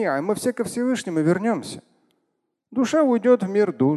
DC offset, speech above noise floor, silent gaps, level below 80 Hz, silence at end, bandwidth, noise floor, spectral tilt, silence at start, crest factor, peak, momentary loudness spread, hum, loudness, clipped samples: under 0.1%; 54 dB; none; -66 dBFS; 0 s; 12.5 kHz; -75 dBFS; -6 dB/octave; 0 s; 16 dB; -6 dBFS; 10 LU; none; -22 LUFS; under 0.1%